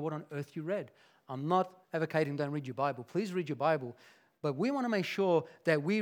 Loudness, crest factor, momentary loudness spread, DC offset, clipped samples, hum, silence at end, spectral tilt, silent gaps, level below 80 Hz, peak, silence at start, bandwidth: -34 LUFS; 20 dB; 10 LU; under 0.1%; under 0.1%; none; 0 s; -7 dB/octave; none; -90 dBFS; -14 dBFS; 0 s; 18 kHz